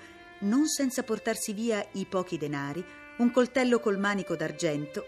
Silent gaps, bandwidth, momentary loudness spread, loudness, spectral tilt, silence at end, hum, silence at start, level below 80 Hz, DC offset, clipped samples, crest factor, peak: none; 14.5 kHz; 9 LU; -29 LUFS; -4.5 dB/octave; 0 s; none; 0 s; -68 dBFS; under 0.1%; under 0.1%; 18 dB; -12 dBFS